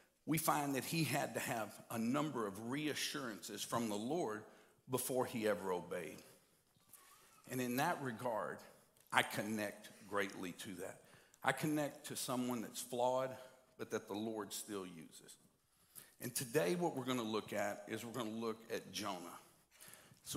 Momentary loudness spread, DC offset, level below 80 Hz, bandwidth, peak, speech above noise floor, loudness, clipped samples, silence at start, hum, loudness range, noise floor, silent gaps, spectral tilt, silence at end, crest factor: 18 LU; under 0.1%; -84 dBFS; 16 kHz; -14 dBFS; 32 dB; -41 LUFS; under 0.1%; 0.25 s; none; 3 LU; -73 dBFS; none; -4 dB/octave; 0 s; 28 dB